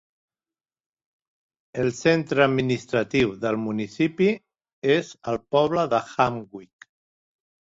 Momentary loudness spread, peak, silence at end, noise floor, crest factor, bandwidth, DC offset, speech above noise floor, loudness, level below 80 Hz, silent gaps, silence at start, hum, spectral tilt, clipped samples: 10 LU; -4 dBFS; 1 s; under -90 dBFS; 22 dB; 7.8 kHz; under 0.1%; over 67 dB; -23 LUFS; -58 dBFS; 4.73-4.82 s; 1.75 s; none; -6 dB/octave; under 0.1%